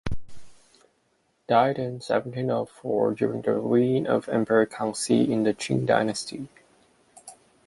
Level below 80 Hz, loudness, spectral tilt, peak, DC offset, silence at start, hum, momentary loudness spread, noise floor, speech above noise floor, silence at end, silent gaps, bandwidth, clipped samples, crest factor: -54 dBFS; -25 LUFS; -5.5 dB/octave; -6 dBFS; under 0.1%; 0.05 s; none; 10 LU; -69 dBFS; 45 dB; 0.35 s; none; 11.5 kHz; under 0.1%; 20 dB